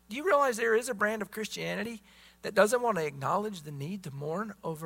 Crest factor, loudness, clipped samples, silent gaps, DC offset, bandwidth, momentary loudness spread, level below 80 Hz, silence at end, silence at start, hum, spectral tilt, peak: 22 dB; -30 LUFS; under 0.1%; none; under 0.1%; 16 kHz; 13 LU; -68 dBFS; 0 s; 0.1 s; none; -4.5 dB/octave; -10 dBFS